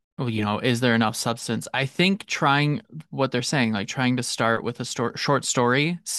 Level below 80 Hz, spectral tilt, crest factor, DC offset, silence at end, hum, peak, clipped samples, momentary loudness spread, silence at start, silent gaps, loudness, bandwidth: -64 dBFS; -4.5 dB/octave; 18 dB; under 0.1%; 0 s; none; -6 dBFS; under 0.1%; 7 LU; 0.2 s; none; -23 LUFS; 12.5 kHz